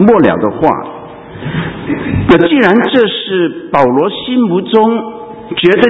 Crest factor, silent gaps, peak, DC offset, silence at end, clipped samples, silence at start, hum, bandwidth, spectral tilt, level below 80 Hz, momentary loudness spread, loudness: 10 dB; none; 0 dBFS; under 0.1%; 0 s; 0.5%; 0 s; none; 8 kHz; -8 dB/octave; -36 dBFS; 15 LU; -11 LUFS